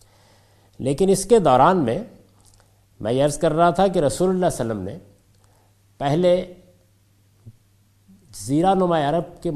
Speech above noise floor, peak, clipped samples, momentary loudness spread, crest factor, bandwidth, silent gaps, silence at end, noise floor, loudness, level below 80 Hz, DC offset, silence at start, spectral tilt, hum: 39 dB; -2 dBFS; under 0.1%; 16 LU; 20 dB; 14.5 kHz; none; 0 s; -58 dBFS; -20 LUFS; -48 dBFS; under 0.1%; 0.8 s; -6 dB/octave; none